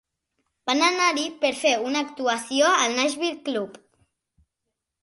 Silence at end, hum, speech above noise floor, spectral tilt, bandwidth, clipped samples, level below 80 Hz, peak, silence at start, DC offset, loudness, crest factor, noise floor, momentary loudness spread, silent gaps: 1.3 s; none; 59 dB; -1 dB/octave; 11.5 kHz; under 0.1%; -72 dBFS; -8 dBFS; 0.65 s; under 0.1%; -23 LUFS; 18 dB; -82 dBFS; 10 LU; none